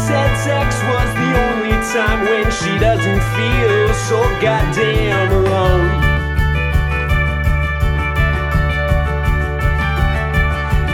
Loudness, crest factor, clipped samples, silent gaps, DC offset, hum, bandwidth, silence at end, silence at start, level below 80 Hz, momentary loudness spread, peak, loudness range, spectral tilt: -16 LUFS; 12 dB; under 0.1%; none; under 0.1%; none; 15 kHz; 0 s; 0 s; -20 dBFS; 3 LU; -2 dBFS; 2 LU; -6 dB/octave